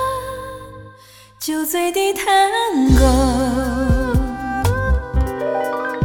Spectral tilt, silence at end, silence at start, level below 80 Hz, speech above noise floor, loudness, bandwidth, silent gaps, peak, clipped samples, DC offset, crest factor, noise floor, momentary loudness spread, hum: -5.5 dB/octave; 0 s; 0 s; -24 dBFS; 29 dB; -18 LUFS; 17.5 kHz; none; -2 dBFS; under 0.1%; under 0.1%; 16 dB; -45 dBFS; 13 LU; none